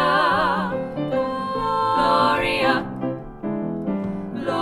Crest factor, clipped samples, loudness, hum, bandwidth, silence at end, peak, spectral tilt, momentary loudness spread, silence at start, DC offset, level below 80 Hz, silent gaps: 16 dB; under 0.1%; -22 LUFS; none; 16 kHz; 0 s; -6 dBFS; -6 dB/octave; 10 LU; 0 s; under 0.1%; -46 dBFS; none